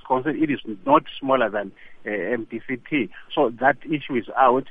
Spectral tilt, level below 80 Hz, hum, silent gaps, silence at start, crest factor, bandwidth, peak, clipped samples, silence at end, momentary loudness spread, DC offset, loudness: -8.5 dB/octave; -58 dBFS; none; none; 0.05 s; 20 dB; 3.8 kHz; -4 dBFS; under 0.1%; 0 s; 11 LU; under 0.1%; -23 LUFS